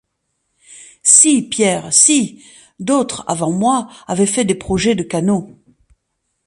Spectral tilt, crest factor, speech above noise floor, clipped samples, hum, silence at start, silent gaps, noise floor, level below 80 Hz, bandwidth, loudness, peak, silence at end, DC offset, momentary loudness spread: -3 dB/octave; 16 dB; 55 dB; under 0.1%; none; 0.7 s; none; -71 dBFS; -48 dBFS; 12.5 kHz; -14 LUFS; 0 dBFS; 0.95 s; under 0.1%; 12 LU